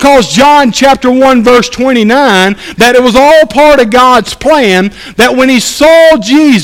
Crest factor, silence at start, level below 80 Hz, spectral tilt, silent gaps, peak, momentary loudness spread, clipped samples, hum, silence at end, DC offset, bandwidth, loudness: 4 dB; 0 s; -32 dBFS; -4 dB/octave; none; 0 dBFS; 4 LU; 8%; none; 0 s; under 0.1%; 17 kHz; -5 LUFS